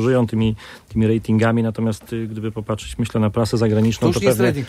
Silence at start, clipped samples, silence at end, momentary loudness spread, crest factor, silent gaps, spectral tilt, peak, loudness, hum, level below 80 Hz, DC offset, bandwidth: 0 s; under 0.1%; 0 s; 10 LU; 16 dB; none; -7 dB/octave; -2 dBFS; -20 LUFS; none; -42 dBFS; under 0.1%; 15.5 kHz